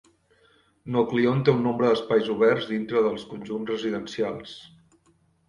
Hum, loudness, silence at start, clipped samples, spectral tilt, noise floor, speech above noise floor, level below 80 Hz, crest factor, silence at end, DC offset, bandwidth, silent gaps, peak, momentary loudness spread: none; -24 LUFS; 0.85 s; under 0.1%; -7 dB/octave; -64 dBFS; 40 dB; -62 dBFS; 18 dB; 0.8 s; under 0.1%; 10.5 kHz; none; -6 dBFS; 14 LU